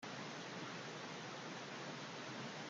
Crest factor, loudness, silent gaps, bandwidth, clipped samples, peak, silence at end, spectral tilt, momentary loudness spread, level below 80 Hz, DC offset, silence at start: 12 dB; -48 LUFS; none; 10 kHz; under 0.1%; -36 dBFS; 0 s; -3.5 dB/octave; 1 LU; -90 dBFS; under 0.1%; 0 s